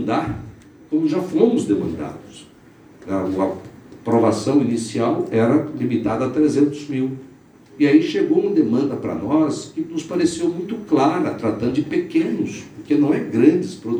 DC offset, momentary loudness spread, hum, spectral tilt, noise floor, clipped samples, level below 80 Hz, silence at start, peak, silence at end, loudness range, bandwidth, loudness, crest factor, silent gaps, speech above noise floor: under 0.1%; 11 LU; none; -6.5 dB/octave; -47 dBFS; under 0.1%; -54 dBFS; 0 s; 0 dBFS; 0 s; 3 LU; 10 kHz; -20 LUFS; 18 dB; none; 28 dB